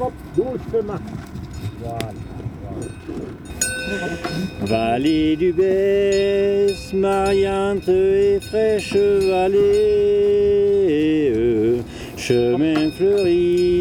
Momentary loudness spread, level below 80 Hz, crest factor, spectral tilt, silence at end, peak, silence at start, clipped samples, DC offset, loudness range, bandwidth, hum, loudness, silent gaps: 15 LU; -40 dBFS; 14 dB; -5.5 dB/octave; 0 s; -6 dBFS; 0 s; under 0.1%; under 0.1%; 10 LU; 16 kHz; none; -18 LUFS; none